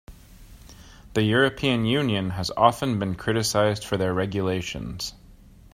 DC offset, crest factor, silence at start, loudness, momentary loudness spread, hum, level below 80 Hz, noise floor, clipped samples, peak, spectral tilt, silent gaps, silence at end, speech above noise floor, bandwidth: under 0.1%; 24 dB; 0.1 s; -24 LUFS; 10 LU; none; -48 dBFS; -49 dBFS; under 0.1%; -2 dBFS; -5 dB/octave; none; 0.4 s; 26 dB; 16 kHz